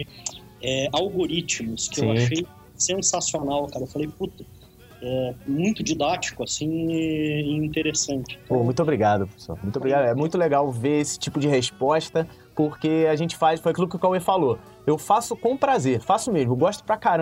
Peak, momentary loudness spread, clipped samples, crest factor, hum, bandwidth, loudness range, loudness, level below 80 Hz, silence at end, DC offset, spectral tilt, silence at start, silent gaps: -6 dBFS; 9 LU; under 0.1%; 18 dB; none; 16 kHz; 4 LU; -24 LUFS; -54 dBFS; 0 s; under 0.1%; -4.5 dB/octave; 0 s; none